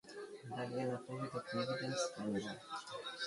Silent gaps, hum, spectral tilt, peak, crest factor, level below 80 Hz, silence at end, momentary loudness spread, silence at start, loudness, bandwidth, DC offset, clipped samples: none; none; -4.5 dB/octave; -26 dBFS; 16 dB; -78 dBFS; 0 s; 8 LU; 0.05 s; -42 LUFS; 11.5 kHz; under 0.1%; under 0.1%